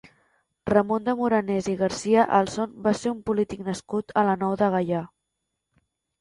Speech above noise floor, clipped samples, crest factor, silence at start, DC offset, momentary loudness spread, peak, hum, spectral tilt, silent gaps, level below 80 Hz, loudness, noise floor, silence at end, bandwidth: 57 dB; under 0.1%; 18 dB; 0.65 s; under 0.1%; 8 LU; -6 dBFS; none; -6 dB/octave; none; -58 dBFS; -24 LUFS; -81 dBFS; 1.15 s; 11.5 kHz